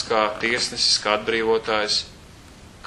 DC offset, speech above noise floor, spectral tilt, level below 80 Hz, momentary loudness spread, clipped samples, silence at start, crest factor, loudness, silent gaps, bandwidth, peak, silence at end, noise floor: under 0.1%; 23 dB; -1.5 dB/octave; -50 dBFS; 4 LU; under 0.1%; 0 s; 20 dB; -21 LUFS; none; 12 kHz; -2 dBFS; 0 s; -45 dBFS